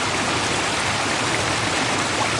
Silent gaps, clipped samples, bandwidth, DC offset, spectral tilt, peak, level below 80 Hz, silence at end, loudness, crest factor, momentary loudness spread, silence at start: none; under 0.1%; 11.5 kHz; under 0.1%; -2.5 dB/octave; -8 dBFS; -46 dBFS; 0 s; -20 LUFS; 14 dB; 0 LU; 0 s